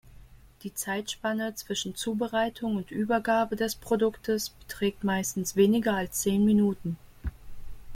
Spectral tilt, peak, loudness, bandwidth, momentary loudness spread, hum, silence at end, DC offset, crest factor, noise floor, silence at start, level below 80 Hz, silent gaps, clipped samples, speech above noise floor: -4.5 dB/octave; -10 dBFS; -28 LUFS; 16.5 kHz; 13 LU; none; 0 s; under 0.1%; 18 dB; -51 dBFS; 0.05 s; -50 dBFS; none; under 0.1%; 24 dB